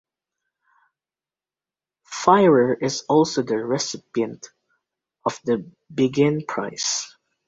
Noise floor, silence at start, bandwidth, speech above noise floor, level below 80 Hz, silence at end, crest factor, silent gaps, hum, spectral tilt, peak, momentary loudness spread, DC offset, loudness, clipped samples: under -90 dBFS; 2.1 s; 8 kHz; over 70 dB; -64 dBFS; 0.4 s; 22 dB; none; none; -4.5 dB/octave; -2 dBFS; 13 LU; under 0.1%; -21 LUFS; under 0.1%